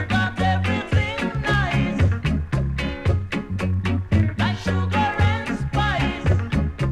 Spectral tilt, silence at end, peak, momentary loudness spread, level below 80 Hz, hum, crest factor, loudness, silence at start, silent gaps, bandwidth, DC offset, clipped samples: -7 dB/octave; 0 s; -6 dBFS; 4 LU; -32 dBFS; none; 14 dB; -22 LUFS; 0 s; none; 10 kHz; under 0.1%; under 0.1%